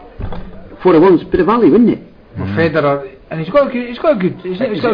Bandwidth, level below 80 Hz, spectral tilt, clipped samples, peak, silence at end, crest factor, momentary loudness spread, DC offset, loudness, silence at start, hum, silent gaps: 5.2 kHz; -36 dBFS; -9.5 dB/octave; under 0.1%; -2 dBFS; 0 s; 12 dB; 18 LU; under 0.1%; -13 LUFS; 0 s; none; none